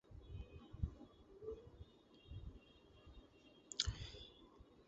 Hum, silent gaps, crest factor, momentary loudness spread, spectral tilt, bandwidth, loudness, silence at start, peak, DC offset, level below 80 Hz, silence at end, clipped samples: none; none; 32 dB; 23 LU; -4 dB/octave; 7.6 kHz; -50 LUFS; 0.05 s; -20 dBFS; under 0.1%; -56 dBFS; 0 s; under 0.1%